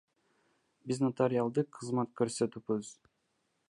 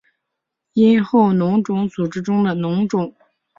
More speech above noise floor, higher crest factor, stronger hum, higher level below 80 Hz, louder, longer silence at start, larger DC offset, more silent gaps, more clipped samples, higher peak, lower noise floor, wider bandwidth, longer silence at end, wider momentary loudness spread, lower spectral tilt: second, 46 dB vs 63 dB; first, 20 dB vs 14 dB; neither; second, -76 dBFS vs -58 dBFS; second, -33 LUFS vs -18 LUFS; about the same, 0.85 s vs 0.75 s; neither; neither; neither; second, -14 dBFS vs -4 dBFS; about the same, -79 dBFS vs -79 dBFS; first, 11.5 kHz vs 7.4 kHz; first, 0.75 s vs 0.5 s; about the same, 8 LU vs 9 LU; second, -6.5 dB/octave vs -8 dB/octave